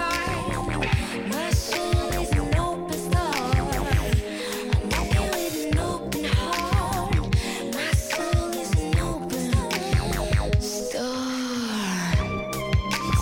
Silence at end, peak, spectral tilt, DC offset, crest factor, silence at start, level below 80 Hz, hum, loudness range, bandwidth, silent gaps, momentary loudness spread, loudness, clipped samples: 0 s; -8 dBFS; -5 dB/octave; under 0.1%; 16 dB; 0 s; -30 dBFS; none; 1 LU; 17 kHz; none; 4 LU; -25 LUFS; under 0.1%